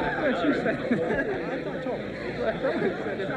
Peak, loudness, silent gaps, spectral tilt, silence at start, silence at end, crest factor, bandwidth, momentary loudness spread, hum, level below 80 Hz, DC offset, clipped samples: -14 dBFS; -28 LUFS; none; -7 dB/octave; 0 s; 0 s; 14 dB; 10 kHz; 7 LU; none; -52 dBFS; under 0.1%; under 0.1%